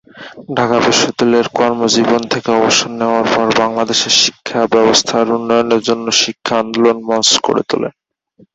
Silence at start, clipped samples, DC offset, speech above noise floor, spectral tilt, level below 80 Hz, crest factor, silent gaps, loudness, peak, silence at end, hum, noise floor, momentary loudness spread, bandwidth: 0.15 s; under 0.1%; under 0.1%; 37 dB; -2.5 dB/octave; -54 dBFS; 14 dB; none; -13 LUFS; 0 dBFS; 0.65 s; none; -50 dBFS; 6 LU; 8.2 kHz